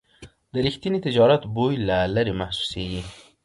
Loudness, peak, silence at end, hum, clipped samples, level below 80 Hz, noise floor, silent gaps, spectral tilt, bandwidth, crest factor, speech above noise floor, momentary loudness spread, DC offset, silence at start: -23 LUFS; -6 dBFS; 0.25 s; none; under 0.1%; -44 dBFS; -49 dBFS; none; -6.5 dB/octave; 11.5 kHz; 18 dB; 27 dB; 13 LU; under 0.1%; 0.2 s